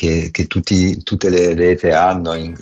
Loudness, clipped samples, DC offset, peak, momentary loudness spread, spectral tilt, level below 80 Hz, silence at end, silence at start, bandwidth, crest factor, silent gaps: -15 LUFS; under 0.1%; under 0.1%; -4 dBFS; 6 LU; -6 dB/octave; -38 dBFS; 0.05 s; 0 s; 8.4 kHz; 10 dB; none